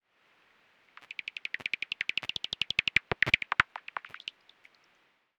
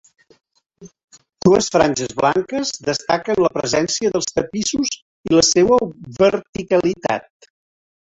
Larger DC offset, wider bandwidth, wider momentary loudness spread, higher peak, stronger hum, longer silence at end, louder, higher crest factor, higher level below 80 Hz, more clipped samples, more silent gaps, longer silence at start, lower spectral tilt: neither; first, 19 kHz vs 8.4 kHz; first, 16 LU vs 9 LU; second, -6 dBFS vs 0 dBFS; neither; first, 1.2 s vs 0.9 s; second, -30 LUFS vs -18 LUFS; first, 28 dB vs 18 dB; second, -64 dBFS vs -50 dBFS; neither; second, none vs 1.04-1.08 s, 5.02-5.24 s, 6.49-6.53 s; first, 1.6 s vs 0.8 s; second, -2.5 dB/octave vs -4 dB/octave